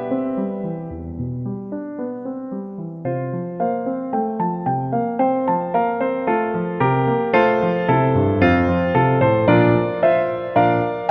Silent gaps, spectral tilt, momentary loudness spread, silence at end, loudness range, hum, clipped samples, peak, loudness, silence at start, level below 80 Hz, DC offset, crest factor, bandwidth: none; -10 dB/octave; 12 LU; 0 s; 10 LU; none; under 0.1%; -2 dBFS; -20 LUFS; 0 s; -46 dBFS; under 0.1%; 16 dB; 5.8 kHz